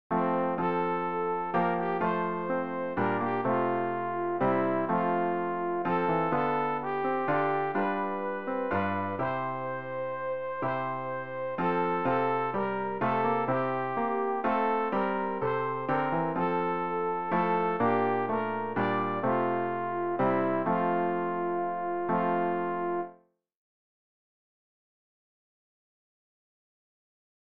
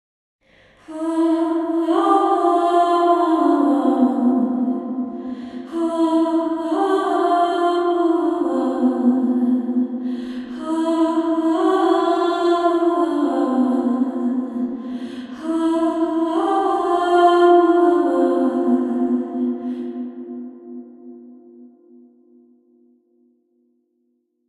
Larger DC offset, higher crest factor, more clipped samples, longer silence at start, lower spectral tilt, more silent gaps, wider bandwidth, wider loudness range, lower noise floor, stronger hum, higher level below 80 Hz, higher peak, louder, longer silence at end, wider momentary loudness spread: first, 0.4% vs under 0.1%; about the same, 16 dB vs 16 dB; neither; second, 0.1 s vs 0.9 s; first, -9.5 dB/octave vs -5.5 dB/octave; neither; second, 5.4 kHz vs 11 kHz; about the same, 4 LU vs 5 LU; second, -58 dBFS vs -68 dBFS; neither; about the same, -66 dBFS vs -66 dBFS; second, -14 dBFS vs -2 dBFS; second, -29 LUFS vs -19 LUFS; first, 3.85 s vs 2.85 s; second, 5 LU vs 13 LU